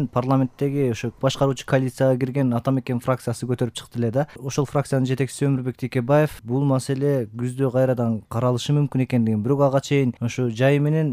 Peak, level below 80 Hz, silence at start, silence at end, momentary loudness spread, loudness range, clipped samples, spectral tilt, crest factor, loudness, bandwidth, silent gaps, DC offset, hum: -8 dBFS; -56 dBFS; 0 s; 0 s; 6 LU; 3 LU; under 0.1%; -7 dB/octave; 14 dB; -22 LUFS; 15 kHz; none; under 0.1%; none